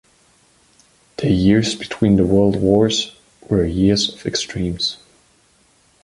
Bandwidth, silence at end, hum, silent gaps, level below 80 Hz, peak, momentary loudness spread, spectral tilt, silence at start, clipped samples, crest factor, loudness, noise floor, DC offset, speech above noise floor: 11.5 kHz; 1.1 s; none; none; -38 dBFS; -2 dBFS; 9 LU; -5.5 dB/octave; 1.2 s; under 0.1%; 16 dB; -17 LUFS; -56 dBFS; under 0.1%; 40 dB